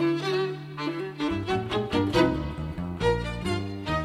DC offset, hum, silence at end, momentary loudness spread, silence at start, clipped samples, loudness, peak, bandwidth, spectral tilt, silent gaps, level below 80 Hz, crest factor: under 0.1%; none; 0 s; 9 LU; 0 s; under 0.1%; -28 LUFS; -10 dBFS; 14 kHz; -6.5 dB/octave; none; -42 dBFS; 18 dB